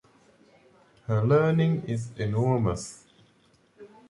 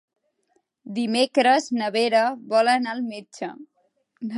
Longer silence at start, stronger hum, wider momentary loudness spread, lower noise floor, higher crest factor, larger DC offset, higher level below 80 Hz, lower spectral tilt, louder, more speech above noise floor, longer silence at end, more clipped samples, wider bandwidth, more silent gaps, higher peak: first, 1.1 s vs 0.85 s; neither; about the same, 14 LU vs 16 LU; second, -63 dBFS vs -70 dBFS; about the same, 18 dB vs 18 dB; neither; first, -54 dBFS vs -80 dBFS; first, -7.5 dB/octave vs -3.5 dB/octave; second, -26 LUFS vs -22 LUFS; second, 38 dB vs 48 dB; first, 0.25 s vs 0 s; neither; about the same, 11.5 kHz vs 11.5 kHz; neither; second, -10 dBFS vs -6 dBFS